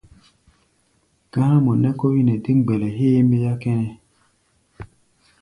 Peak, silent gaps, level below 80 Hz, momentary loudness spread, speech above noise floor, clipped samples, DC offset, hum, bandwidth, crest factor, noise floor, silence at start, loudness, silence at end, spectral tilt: -4 dBFS; none; -54 dBFS; 7 LU; 46 dB; under 0.1%; under 0.1%; none; 10.5 kHz; 16 dB; -64 dBFS; 1.35 s; -19 LUFS; 0.55 s; -10 dB/octave